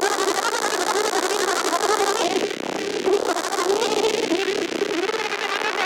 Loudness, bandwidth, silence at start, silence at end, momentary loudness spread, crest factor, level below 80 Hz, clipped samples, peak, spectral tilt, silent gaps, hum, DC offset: -22 LUFS; 17 kHz; 0 s; 0 s; 4 LU; 18 dB; -64 dBFS; under 0.1%; -4 dBFS; -1.5 dB/octave; none; none; under 0.1%